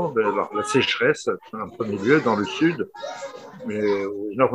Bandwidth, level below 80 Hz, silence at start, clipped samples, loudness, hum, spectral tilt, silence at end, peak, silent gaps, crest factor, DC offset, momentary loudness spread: 11.5 kHz; -64 dBFS; 0 s; under 0.1%; -23 LUFS; none; -5 dB/octave; 0 s; -4 dBFS; none; 20 dB; under 0.1%; 14 LU